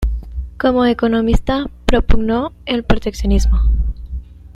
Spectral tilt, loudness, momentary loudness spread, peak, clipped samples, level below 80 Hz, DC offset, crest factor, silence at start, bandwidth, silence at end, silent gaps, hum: -6.5 dB/octave; -17 LUFS; 12 LU; 0 dBFS; under 0.1%; -18 dBFS; under 0.1%; 14 dB; 0 s; 12 kHz; 0.05 s; none; none